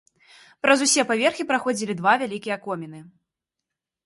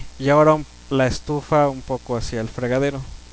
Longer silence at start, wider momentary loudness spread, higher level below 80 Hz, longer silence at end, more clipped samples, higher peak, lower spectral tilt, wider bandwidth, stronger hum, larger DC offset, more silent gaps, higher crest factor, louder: first, 0.65 s vs 0 s; about the same, 13 LU vs 11 LU; second, -72 dBFS vs -40 dBFS; first, 1 s vs 0.05 s; neither; about the same, -4 dBFS vs -4 dBFS; second, -2.5 dB/octave vs -6.5 dB/octave; first, 11.5 kHz vs 8 kHz; neither; second, under 0.1% vs 0.4%; neither; about the same, 20 dB vs 16 dB; about the same, -22 LUFS vs -20 LUFS